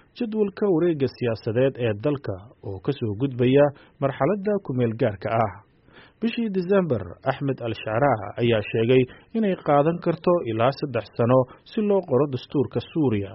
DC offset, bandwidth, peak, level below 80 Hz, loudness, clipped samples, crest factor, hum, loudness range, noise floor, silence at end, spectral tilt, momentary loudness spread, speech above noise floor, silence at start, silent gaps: under 0.1%; 5.8 kHz; -6 dBFS; -58 dBFS; -24 LUFS; under 0.1%; 16 dB; none; 3 LU; -52 dBFS; 0 s; -6.5 dB/octave; 8 LU; 29 dB; 0.15 s; none